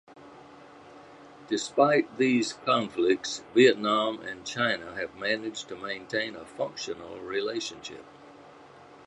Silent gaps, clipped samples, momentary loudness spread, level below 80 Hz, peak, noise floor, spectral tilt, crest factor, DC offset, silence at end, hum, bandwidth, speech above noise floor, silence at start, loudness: none; under 0.1%; 15 LU; -70 dBFS; -6 dBFS; -51 dBFS; -4 dB/octave; 22 dB; under 0.1%; 0.2 s; none; 11 kHz; 23 dB; 0.1 s; -28 LUFS